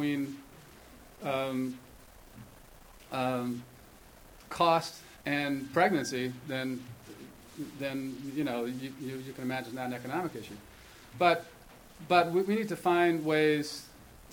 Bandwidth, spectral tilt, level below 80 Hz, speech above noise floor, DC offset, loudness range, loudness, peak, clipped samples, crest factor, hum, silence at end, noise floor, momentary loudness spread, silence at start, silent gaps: 19.5 kHz; -5 dB/octave; -62 dBFS; 23 dB; under 0.1%; 9 LU; -31 LUFS; -10 dBFS; under 0.1%; 22 dB; none; 0 s; -54 dBFS; 23 LU; 0 s; none